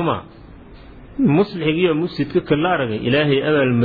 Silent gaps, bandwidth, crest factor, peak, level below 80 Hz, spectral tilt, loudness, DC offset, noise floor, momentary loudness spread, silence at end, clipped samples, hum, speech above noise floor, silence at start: none; 4.9 kHz; 14 dB; -4 dBFS; -46 dBFS; -9.5 dB/octave; -18 LUFS; under 0.1%; -40 dBFS; 5 LU; 0 s; under 0.1%; none; 23 dB; 0 s